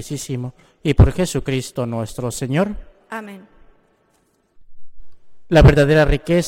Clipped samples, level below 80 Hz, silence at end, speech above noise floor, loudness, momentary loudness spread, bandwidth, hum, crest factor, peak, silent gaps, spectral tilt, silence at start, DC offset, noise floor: under 0.1%; -26 dBFS; 0 s; 45 dB; -17 LUFS; 20 LU; 16 kHz; none; 16 dB; -2 dBFS; none; -6.5 dB/octave; 0 s; under 0.1%; -62 dBFS